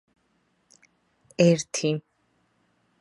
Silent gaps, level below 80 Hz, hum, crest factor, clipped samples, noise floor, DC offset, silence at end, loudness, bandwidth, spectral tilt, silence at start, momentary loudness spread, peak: none; -72 dBFS; none; 22 dB; under 0.1%; -70 dBFS; under 0.1%; 1 s; -24 LUFS; 11.5 kHz; -5.5 dB/octave; 1.4 s; 13 LU; -6 dBFS